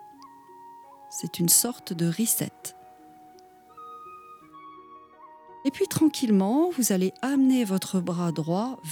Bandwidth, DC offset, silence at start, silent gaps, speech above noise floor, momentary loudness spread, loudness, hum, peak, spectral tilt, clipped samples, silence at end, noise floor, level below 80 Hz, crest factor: 20 kHz; under 0.1%; 0 s; none; 28 dB; 25 LU; -24 LUFS; none; -8 dBFS; -4.5 dB/octave; under 0.1%; 0 s; -52 dBFS; -74 dBFS; 20 dB